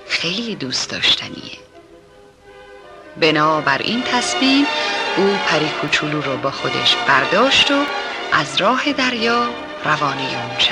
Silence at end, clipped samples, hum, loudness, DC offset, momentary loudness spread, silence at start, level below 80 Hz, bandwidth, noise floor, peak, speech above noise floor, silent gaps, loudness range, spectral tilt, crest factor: 0 s; under 0.1%; none; -16 LUFS; under 0.1%; 9 LU; 0 s; -54 dBFS; 11.5 kHz; -46 dBFS; -4 dBFS; 28 dB; none; 4 LU; -3 dB/octave; 16 dB